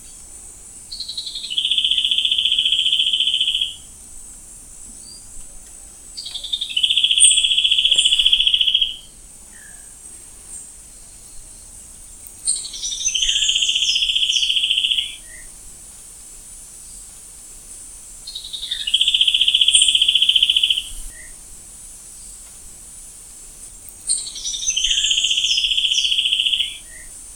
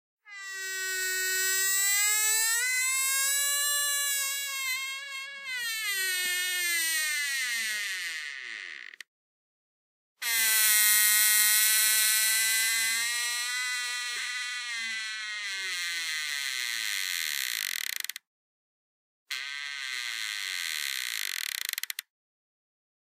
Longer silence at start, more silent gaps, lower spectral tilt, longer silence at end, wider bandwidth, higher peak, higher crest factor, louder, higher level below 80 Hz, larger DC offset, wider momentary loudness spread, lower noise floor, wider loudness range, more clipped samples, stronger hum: second, 0 s vs 0.25 s; second, none vs 9.08-10.16 s, 18.27-19.26 s; first, 3.5 dB/octave vs 5 dB/octave; second, 0 s vs 1.15 s; about the same, 17 kHz vs 16 kHz; first, 0 dBFS vs -8 dBFS; about the same, 22 dB vs 22 dB; first, -15 LUFS vs -26 LUFS; first, -46 dBFS vs under -90 dBFS; neither; first, 24 LU vs 14 LU; second, -41 dBFS vs under -90 dBFS; first, 15 LU vs 11 LU; neither; neither